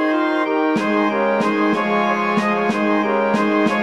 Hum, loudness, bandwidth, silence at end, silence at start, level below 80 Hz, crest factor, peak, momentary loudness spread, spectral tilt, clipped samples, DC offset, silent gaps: none; -18 LUFS; 11.5 kHz; 0 s; 0 s; -68 dBFS; 14 dB; -4 dBFS; 1 LU; -6 dB/octave; under 0.1%; 0.2%; none